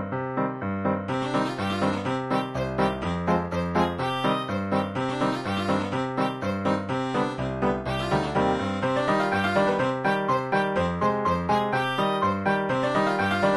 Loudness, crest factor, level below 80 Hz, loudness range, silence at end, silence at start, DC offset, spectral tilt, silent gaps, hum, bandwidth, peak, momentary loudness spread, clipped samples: -25 LUFS; 14 dB; -50 dBFS; 3 LU; 0 s; 0 s; under 0.1%; -6.5 dB/octave; none; none; 12.5 kHz; -10 dBFS; 4 LU; under 0.1%